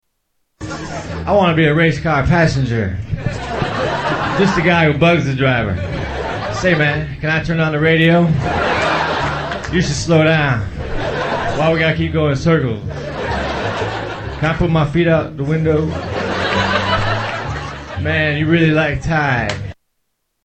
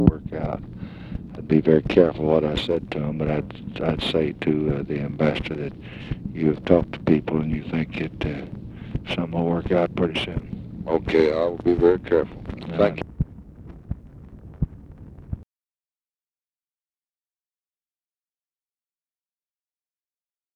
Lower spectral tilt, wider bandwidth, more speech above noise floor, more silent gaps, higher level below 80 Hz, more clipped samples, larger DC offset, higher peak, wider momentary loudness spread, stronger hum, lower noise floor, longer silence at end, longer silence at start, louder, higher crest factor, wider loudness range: second, -6 dB/octave vs -8 dB/octave; second, 8.6 kHz vs 10.5 kHz; second, 55 dB vs over 68 dB; neither; first, -32 dBFS vs -40 dBFS; neither; neither; about the same, 0 dBFS vs 0 dBFS; second, 10 LU vs 18 LU; neither; second, -70 dBFS vs under -90 dBFS; second, 0.7 s vs 5.15 s; first, 0.6 s vs 0 s; first, -16 LUFS vs -23 LUFS; second, 16 dB vs 24 dB; second, 3 LU vs 13 LU